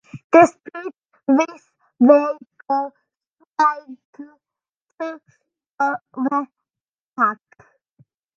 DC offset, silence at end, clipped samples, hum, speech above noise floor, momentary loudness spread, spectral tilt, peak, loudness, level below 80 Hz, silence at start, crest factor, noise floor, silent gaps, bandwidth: under 0.1%; 1.05 s; under 0.1%; none; over 72 dB; 21 LU; -6 dB/octave; 0 dBFS; -19 LUFS; -70 dBFS; 0.15 s; 20 dB; under -90 dBFS; 0.24-0.30 s, 3.27-3.31 s, 3.51-3.55 s, 4.05-4.13 s, 4.69-4.73 s, 4.82-4.87 s, 5.66-5.78 s, 6.88-7.11 s; 9.2 kHz